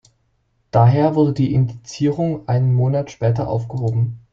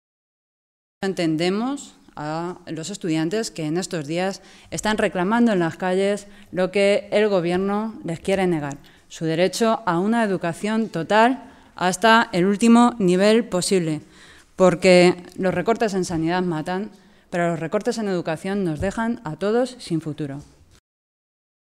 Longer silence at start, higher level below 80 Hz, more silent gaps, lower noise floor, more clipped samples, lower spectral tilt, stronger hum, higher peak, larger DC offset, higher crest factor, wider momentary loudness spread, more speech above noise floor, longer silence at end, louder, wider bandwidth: second, 0.75 s vs 1 s; about the same, -48 dBFS vs -52 dBFS; neither; first, -65 dBFS vs -48 dBFS; neither; first, -8.5 dB/octave vs -5.5 dB/octave; neither; about the same, -2 dBFS vs -2 dBFS; neither; about the same, 16 dB vs 20 dB; second, 8 LU vs 14 LU; first, 48 dB vs 28 dB; second, 0.15 s vs 1.35 s; first, -18 LUFS vs -21 LUFS; second, 7.2 kHz vs 14 kHz